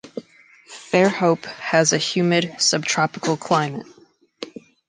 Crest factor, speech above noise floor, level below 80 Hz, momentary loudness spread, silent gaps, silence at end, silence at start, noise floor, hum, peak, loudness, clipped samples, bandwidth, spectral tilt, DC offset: 20 dB; 31 dB; -68 dBFS; 19 LU; none; 0.4 s; 0.05 s; -51 dBFS; none; -2 dBFS; -19 LUFS; under 0.1%; 10.5 kHz; -3.5 dB/octave; under 0.1%